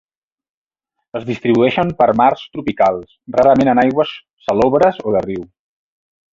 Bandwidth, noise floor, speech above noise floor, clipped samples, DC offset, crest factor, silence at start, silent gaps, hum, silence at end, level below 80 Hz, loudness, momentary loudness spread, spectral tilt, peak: 7.6 kHz; -77 dBFS; 62 dB; under 0.1%; under 0.1%; 16 dB; 1.15 s; 4.33-4.37 s; none; 0.9 s; -48 dBFS; -15 LUFS; 14 LU; -7.5 dB/octave; -2 dBFS